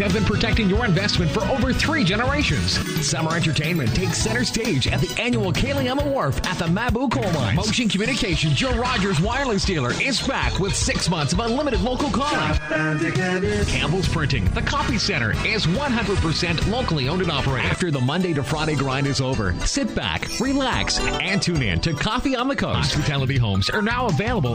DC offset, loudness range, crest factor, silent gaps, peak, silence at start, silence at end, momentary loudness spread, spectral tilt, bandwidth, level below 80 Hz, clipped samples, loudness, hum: under 0.1%; 1 LU; 14 dB; none; -8 dBFS; 0 s; 0 s; 2 LU; -4.5 dB/octave; 15.5 kHz; -32 dBFS; under 0.1%; -21 LUFS; none